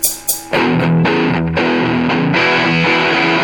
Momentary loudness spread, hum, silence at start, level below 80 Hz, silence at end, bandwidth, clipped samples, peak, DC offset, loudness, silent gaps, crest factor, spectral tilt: 3 LU; none; 0 s; -42 dBFS; 0 s; 19 kHz; under 0.1%; 0 dBFS; 0.1%; -13 LUFS; none; 14 dB; -4.5 dB/octave